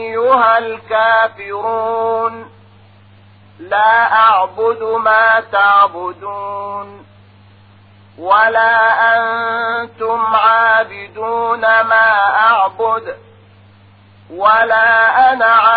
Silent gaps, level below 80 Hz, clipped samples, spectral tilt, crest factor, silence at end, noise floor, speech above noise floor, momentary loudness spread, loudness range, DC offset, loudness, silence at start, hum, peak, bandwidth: none; -60 dBFS; under 0.1%; -6 dB/octave; 14 dB; 0 s; -44 dBFS; 32 dB; 14 LU; 4 LU; 0.1%; -12 LUFS; 0 s; none; 0 dBFS; 4.9 kHz